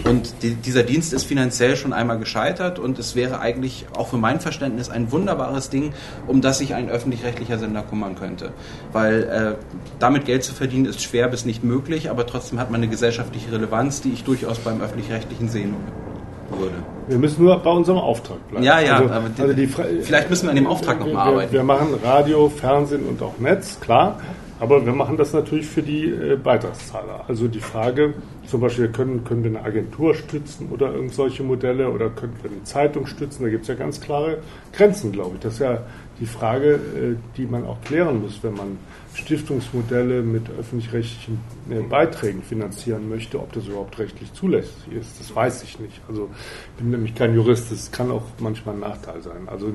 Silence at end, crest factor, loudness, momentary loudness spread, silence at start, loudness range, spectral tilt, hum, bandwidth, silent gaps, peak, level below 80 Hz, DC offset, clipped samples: 0 s; 20 dB; -21 LUFS; 14 LU; 0 s; 7 LU; -6 dB/octave; none; 12 kHz; none; 0 dBFS; -44 dBFS; under 0.1%; under 0.1%